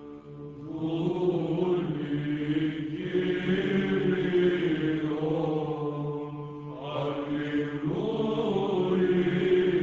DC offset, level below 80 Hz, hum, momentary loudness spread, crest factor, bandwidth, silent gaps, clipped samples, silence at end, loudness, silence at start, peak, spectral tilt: under 0.1%; -58 dBFS; none; 11 LU; 14 dB; 7.4 kHz; none; under 0.1%; 0 s; -28 LUFS; 0 s; -14 dBFS; -8.5 dB/octave